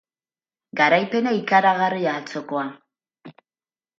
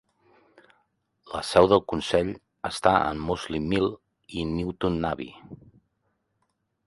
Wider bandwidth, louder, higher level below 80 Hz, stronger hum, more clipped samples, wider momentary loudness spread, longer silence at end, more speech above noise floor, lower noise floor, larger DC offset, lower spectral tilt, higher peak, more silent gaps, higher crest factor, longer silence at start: second, 7.6 kHz vs 11.5 kHz; first, -20 LUFS vs -25 LUFS; second, -76 dBFS vs -48 dBFS; neither; neither; second, 12 LU vs 16 LU; second, 0.7 s vs 1.3 s; first, over 70 dB vs 50 dB; first, under -90 dBFS vs -75 dBFS; neither; about the same, -5.5 dB/octave vs -5.5 dB/octave; about the same, -4 dBFS vs -4 dBFS; neither; about the same, 20 dB vs 24 dB; second, 0.75 s vs 1.25 s